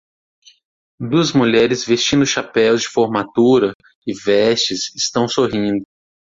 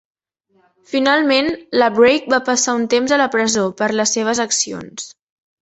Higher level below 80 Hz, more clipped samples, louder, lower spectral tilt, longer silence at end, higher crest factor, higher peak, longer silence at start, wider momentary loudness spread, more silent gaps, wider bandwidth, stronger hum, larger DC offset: first, -52 dBFS vs -58 dBFS; neither; about the same, -16 LUFS vs -16 LUFS; first, -4 dB/octave vs -2 dB/octave; about the same, 0.55 s vs 0.5 s; about the same, 14 dB vs 16 dB; about the same, -2 dBFS vs -2 dBFS; about the same, 1 s vs 0.9 s; about the same, 8 LU vs 10 LU; first, 3.75-3.80 s, 3.95-4.02 s vs none; about the same, 7.8 kHz vs 8.2 kHz; neither; neither